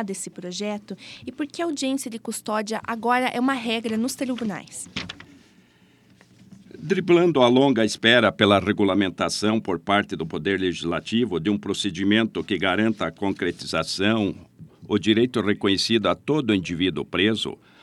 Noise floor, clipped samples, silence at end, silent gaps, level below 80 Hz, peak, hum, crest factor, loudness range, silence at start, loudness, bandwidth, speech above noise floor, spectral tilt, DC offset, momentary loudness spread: -57 dBFS; under 0.1%; 0.3 s; none; -58 dBFS; -2 dBFS; none; 22 dB; 7 LU; 0 s; -23 LUFS; 14 kHz; 34 dB; -4.5 dB/octave; under 0.1%; 14 LU